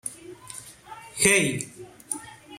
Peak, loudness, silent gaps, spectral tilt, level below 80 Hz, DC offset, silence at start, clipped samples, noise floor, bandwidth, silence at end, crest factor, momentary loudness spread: -2 dBFS; -23 LUFS; none; -2.5 dB/octave; -60 dBFS; under 0.1%; 0.05 s; under 0.1%; -45 dBFS; 16.5 kHz; 0 s; 28 dB; 25 LU